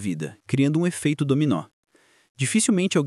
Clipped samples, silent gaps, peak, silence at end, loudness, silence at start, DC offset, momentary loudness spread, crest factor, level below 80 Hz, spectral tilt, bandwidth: under 0.1%; 1.73-1.83 s, 2.29-2.35 s; -8 dBFS; 0 s; -23 LUFS; 0 s; under 0.1%; 8 LU; 16 dB; -70 dBFS; -5 dB/octave; 13.5 kHz